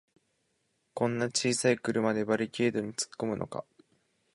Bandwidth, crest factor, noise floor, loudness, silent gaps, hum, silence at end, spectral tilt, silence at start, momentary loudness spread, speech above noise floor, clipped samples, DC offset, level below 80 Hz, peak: 11.5 kHz; 20 dB; -76 dBFS; -30 LUFS; none; none; 0.75 s; -4 dB/octave; 0.95 s; 9 LU; 46 dB; under 0.1%; under 0.1%; -68 dBFS; -12 dBFS